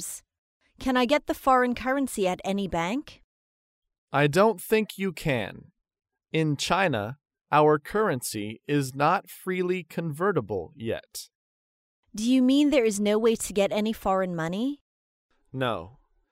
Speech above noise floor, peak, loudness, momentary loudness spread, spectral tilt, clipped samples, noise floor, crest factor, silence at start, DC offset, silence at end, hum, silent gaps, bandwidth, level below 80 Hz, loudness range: over 65 dB; -8 dBFS; -26 LUFS; 13 LU; -5 dB/octave; under 0.1%; under -90 dBFS; 20 dB; 0 s; under 0.1%; 0.4 s; none; 0.38-0.60 s, 3.24-3.82 s, 3.98-4.08 s, 11.35-12.03 s, 14.81-15.29 s; 16 kHz; -56 dBFS; 4 LU